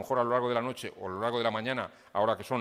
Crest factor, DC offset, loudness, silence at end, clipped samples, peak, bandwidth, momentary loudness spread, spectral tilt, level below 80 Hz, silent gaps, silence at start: 18 dB; under 0.1%; -31 LUFS; 0 s; under 0.1%; -14 dBFS; 16 kHz; 9 LU; -5.5 dB/octave; -72 dBFS; none; 0 s